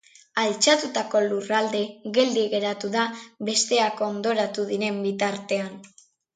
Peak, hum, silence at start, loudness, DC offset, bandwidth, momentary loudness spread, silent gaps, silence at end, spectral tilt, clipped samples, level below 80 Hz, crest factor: -4 dBFS; none; 0.35 s; -24 LUFS; under 0.1%; 9.6 kHz; 8 LU; none; 0.5 s; -2.5 dB/octave; under 0.1%; -74 dBFS; 20 dB